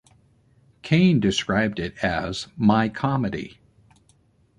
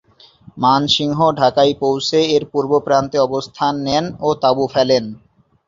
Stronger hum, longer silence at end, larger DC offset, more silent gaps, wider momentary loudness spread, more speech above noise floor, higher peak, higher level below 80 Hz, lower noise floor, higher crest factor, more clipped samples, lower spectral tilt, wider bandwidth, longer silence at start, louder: neither; first, 1.1 s vs 0.5 s; neither; neither; first, 12 LU vs 6 LU; first, 39 dB vs 30 dB; second, -6 dBFS vs -2 dBFS; about the same, -48 dBFS vs -52 dBFS; first, -61 dBFS vs -45 dBFS; about the same, 18 dB vs 16 dB; neither; about the same, -6 dB/octave vs -5 dB/octave; first, 10.5 kHz vs 7.6 kHz; first, 0.85 s vs 0.55 s; second, -22 LUFS vs -16 LUFS